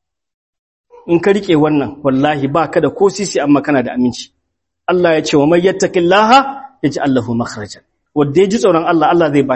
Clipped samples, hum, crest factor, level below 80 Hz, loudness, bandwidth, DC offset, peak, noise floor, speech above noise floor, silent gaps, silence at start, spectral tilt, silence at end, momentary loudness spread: under 0.1%; none; 14 dB; -48 dBFS; -13 LUFS; 8.6 kHz; under 0.1%; 0 dBFS; -72 dBFS; 60 dB; none; 1.05 s; -5.5 dB/octave; 0 s; 9 LU